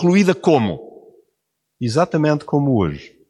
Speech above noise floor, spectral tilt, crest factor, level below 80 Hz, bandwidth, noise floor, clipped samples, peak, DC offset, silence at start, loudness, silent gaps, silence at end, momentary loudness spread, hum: 58 dB; -7 dB/octave; 16 dB; -50 dBFS; 12 kHz; -75 dBFS; under 0.1%; -2 dBFS; under 0.1%; 0 s; -18 LUFS; none; 0.25 s; 9 LU; none